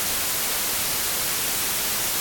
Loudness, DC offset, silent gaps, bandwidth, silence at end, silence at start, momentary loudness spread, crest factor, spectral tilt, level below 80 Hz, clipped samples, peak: -22 LUFS; under 0.1%; none; 17.5 kHz; 0 s; 0 s; 0 LU; 14 dB; 0 dB/octave; -48 dBFS; under 0.1%; -12 dBFS